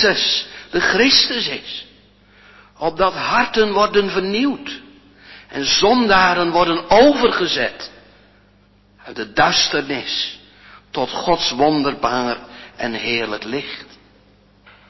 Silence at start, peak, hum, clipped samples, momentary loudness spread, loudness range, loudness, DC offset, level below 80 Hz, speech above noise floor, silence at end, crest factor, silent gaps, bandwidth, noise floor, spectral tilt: 0 s; 0 dBFS; 50 Hz at -50 dBFS; under 0.1%; 17 LU; 5 LU; -17 LUFS; under 0.1%; -48 dBFS; 36 dB; 1.05 s; 18 dB; none; 6.2 kHz; -53 dBFS; -3.5 dB/octave